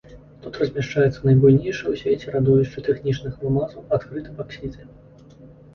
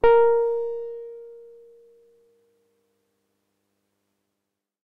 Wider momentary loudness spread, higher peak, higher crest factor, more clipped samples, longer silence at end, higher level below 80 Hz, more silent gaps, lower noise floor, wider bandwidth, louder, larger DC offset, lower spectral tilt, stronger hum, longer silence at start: second, 18 LU vs 25 LU; first, -4 dBFS vs -8 dBFS; about the same, 18 dB vs 18 dB; neither; second, 0.25 s vs 3.5 s; about the same, -46 dBFS vs -50 dBFS; neither; second, -46 dBFS vs -83 dBFS; first, 6.8 kHz vs 4.4 kHz; about the same, -21 LUFS vs -22 LUFS; neither; first, -8.5 dB/octave vs -6.5 dB/octave; neither; about the same, 0.1 s vs 0.05 s